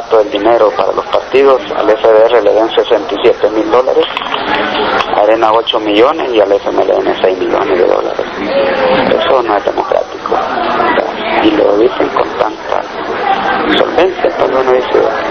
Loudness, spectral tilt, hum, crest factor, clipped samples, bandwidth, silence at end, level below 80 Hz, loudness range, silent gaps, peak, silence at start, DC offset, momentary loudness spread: -11 LUFS; -5 dB/octave; none; 10 dB; 0.6%; 6.6 kHz; 0 s; -42 dBFS; 2 LU; none; 0 dBFS; 0 s; under 0.1%; 6 LU